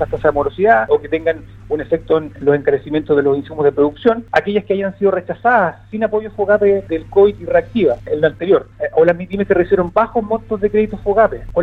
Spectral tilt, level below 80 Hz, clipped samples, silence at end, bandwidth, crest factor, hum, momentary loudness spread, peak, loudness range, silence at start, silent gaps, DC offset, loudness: -8.5 dB/octave; -40 dBFS; under 0.1%; 0 s; 5.6 kHz; 16 dB; none; 6 LU; 0 dBFS; 1 LU; 0 s; none; under 0.1%; -16 LUFS